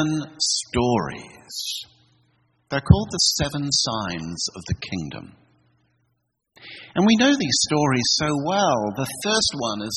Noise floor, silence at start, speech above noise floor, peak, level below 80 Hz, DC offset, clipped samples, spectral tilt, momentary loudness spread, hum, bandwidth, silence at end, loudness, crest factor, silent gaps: -73 dBFS; 0 s; 51 dB; 0 dBFS; -44 dBFS; under 0.1%; under 0.1%; -4 dB/octave; 14 LU; none; 12.5 kHz; 0 s; -21 LUFS; 24 dB; none